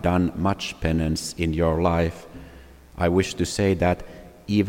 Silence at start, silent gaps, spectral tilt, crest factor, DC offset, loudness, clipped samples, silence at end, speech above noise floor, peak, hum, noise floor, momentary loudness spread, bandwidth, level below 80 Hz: 0 s; none; -6 dB/octave; 18 dB; under 0.1%; -24 LUFS; under 0.1%; 0 s; 23 dB; -6 dBFS; none; -46 dBFS; 20 LU; 16.5 kHz; -40 dBFS